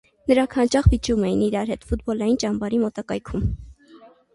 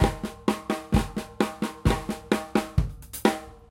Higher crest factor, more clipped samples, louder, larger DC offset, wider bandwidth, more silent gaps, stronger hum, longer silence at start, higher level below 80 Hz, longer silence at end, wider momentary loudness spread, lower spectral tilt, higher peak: about the same, 18 dB vs 22 dB; neither; first, -22 LUFS vs -28 LUFS; neither; second, 11.5 kHz vs 16.5 kHz; neither; neither; first, 0.25 s vs 0 s; about the same, -32 dBFS vs -36 dBFS; first, 0.3 s vs 0.15 s; first, 9 LU vs 4 LU; about the same, -6.5 dB/octave vs -6 dB/octave; about the same, -4 dBFS vs -6 dBFS